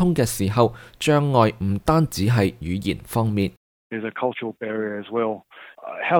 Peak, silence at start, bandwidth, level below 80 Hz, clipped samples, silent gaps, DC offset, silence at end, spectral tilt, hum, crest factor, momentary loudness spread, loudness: -4 dBFS; 0 s; 19.5 kHz; -46 dBFS; under 0.1%; 3.57-3.90 s; under 0.1%; 0 s; -6 dB/octave; none; 18 dB; 11 LU; -22 LUFS